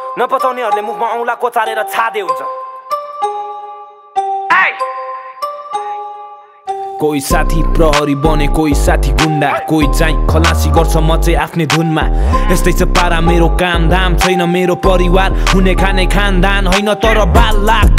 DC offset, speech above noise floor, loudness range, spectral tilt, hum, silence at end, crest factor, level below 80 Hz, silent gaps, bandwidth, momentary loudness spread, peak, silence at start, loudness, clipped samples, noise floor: under 0.1%; 23 dB; 6 LU; -5 dB/octave; none; 0 s; 12 dB; -16 dBFS; none; 16 kHz; 12 LU; 0 dBFS; 0 s; -13 LUFS; under 0.1%; -33 dBFS